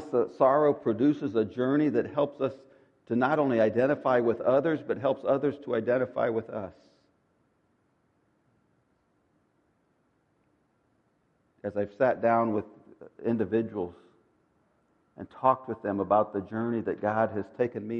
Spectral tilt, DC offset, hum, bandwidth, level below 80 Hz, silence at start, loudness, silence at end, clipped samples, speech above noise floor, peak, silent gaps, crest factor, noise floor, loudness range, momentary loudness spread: -9 dB/octave; under 0.1%; none; 6.6 kHz; -72 dBFS; 0 s; -28 LUFS; 0 s; under 0.1%; 44 dB; -8 dBFS; none; 20 dB; -71 dBFS; 8 LU; 10 LU